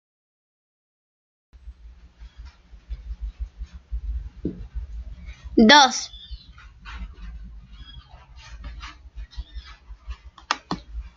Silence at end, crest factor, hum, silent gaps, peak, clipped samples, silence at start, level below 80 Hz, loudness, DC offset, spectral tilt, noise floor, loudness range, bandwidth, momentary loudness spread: 0.05 s; 26 dB; none; none; 0 dBFS; under 0.1%; 1.65 s; -38 dBFS; -20 LUFS; under 0.1%; -3.5 dB/octave; -47 dBFS; 22 LU; 7.6 kHz; 27 LU